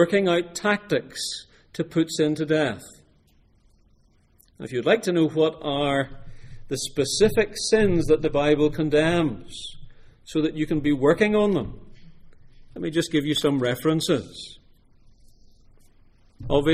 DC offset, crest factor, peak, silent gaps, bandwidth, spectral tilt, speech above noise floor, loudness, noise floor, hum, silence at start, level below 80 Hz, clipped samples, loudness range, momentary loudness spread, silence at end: under 0.1%; 20 dB; -4 dBFS; none; 15.5 kHz; -5 dB/octave; 37 dB; -23 LUFS; -59 dBFS; none; 0 s; -44 dBFS; under 0.1%; 6 LU; 16 LU; 0 s